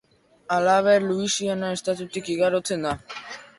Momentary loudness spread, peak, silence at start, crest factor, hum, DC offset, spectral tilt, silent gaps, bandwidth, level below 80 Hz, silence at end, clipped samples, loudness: 11 LU; -8 dBFS; 0.5 s; 16 dB; none; under 0.1%; -4 dB/octave; none; 11.5 kHz; -58 dBFS; 0.1 s; under 0.1%; -23 LUFS